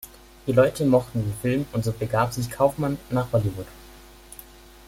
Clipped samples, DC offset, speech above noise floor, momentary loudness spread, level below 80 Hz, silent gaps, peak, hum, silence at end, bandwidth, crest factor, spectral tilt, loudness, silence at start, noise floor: under 0.1%; under 0.1%; 24 dB; 23 LU; -48 dBFS; none; -4 dBFS; none; 0.45 s; 16.5 kHz; 20 dB; -7 dB/octave; -24 LUFS; 0.05 s; -47 dBFS